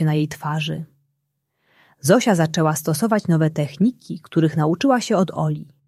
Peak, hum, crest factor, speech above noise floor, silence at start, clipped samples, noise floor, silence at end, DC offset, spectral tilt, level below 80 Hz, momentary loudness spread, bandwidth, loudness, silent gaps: -2 dBFS; none; 18 dB; 55 dB; 0 s; under 0.1%; -74 dBFS; 0.25 s; under 0.1%; -6 dB/octave; -60 dBFS; 8 LU; 14.5 kHz; -20 LUFS; none